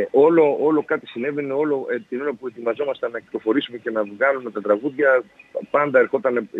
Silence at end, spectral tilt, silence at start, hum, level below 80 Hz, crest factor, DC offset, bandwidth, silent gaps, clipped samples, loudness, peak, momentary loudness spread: 0 s; -7.5 dB/octave; 0 s; none; -72 dBFS; 16 dB; under 0.1%; 4.1 kHz; none; under 0.1%; -21 LUFS; -4 dBFS; 10 LU